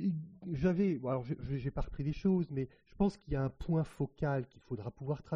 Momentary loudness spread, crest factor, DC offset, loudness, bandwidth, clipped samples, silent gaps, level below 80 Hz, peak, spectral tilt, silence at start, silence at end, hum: 10 LU; 16 dB; under 0.1%; -36 LUFS; 7.6 kHz; under 0.1%; none; -50 dBFS; -20 dBFS; -9 dB/octave; 0 s; 0 s; none